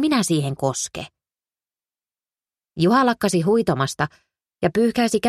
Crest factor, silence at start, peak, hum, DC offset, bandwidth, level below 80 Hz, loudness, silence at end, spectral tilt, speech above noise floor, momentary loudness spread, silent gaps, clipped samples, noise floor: 16 dB; 0 s; -6 dBFS; none; under 0.1%; 14 kHz; -56 dBFS; -21 LUFS; 0 s; -5 dB/octave; over 70 dB; 11 LU; none; under 0.1%; under -90 dBFS